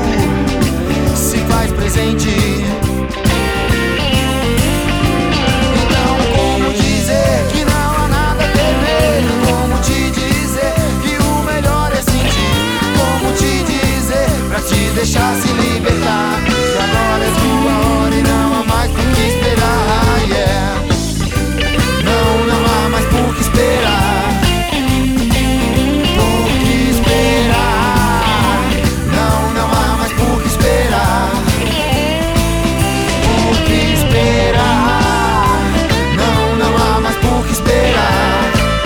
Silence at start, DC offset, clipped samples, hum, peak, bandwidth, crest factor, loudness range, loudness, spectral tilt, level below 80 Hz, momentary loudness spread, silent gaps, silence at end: 0 s; under 0.1%; under 0.1%; none; 0 dBFS; over 20 kHz; 12 dB; 2 LU; -13 LUFS; -5 dB/octave; -20 dBFS; 3 LU; none; 0 s